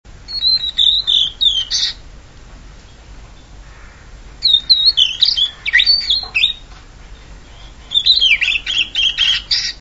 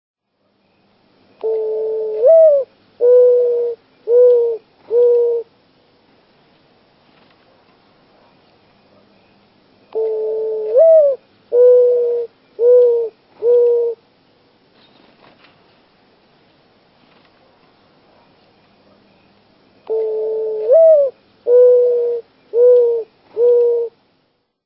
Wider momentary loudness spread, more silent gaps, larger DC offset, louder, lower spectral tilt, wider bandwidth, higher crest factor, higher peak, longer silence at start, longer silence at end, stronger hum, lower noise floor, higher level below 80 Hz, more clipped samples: second, 7 LU vs 14 LU; neither; first, 0.1% vs under 0.1%; about the same, -12 LUFS vs -14 LUFS; second, 1 dB/octave vs -8.5 dB/octave; first, 11 kHz vs 3.3 kHz; about the same, 18 dB vs 14 dB; about the same, 0 dBFS vs -2 dBFS; second, 0.05 s vs 1.45 s; second, 0 s vs 0.75 s; neither; second, -38 dBFS vs -64 dBFS; first, -38 dBFS vs -74 dBFS; neither